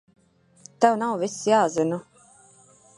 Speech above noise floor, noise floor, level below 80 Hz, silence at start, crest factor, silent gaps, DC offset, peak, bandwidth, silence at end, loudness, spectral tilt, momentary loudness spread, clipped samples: 33 dB; -55 dBFS; -72 dBFS; 0.8 s; 22 dB; none; under 0.1%; -4 dBFS; 11.5 kHz; 0.95 s; -23 LUFS; -4.5 dB/octave; 7 LU; under 0.1%